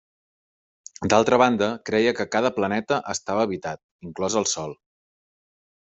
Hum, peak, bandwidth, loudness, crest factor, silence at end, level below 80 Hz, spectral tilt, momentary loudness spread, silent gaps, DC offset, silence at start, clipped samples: none; -4 dBFS; 8.2 kHz; -23 LUFS; 22 dB; 1.1 s; -62 dBFS; -4 dB/octave; 13 LU; 3.83-3.99 s; under 0.1%; 1 s; under 0.1%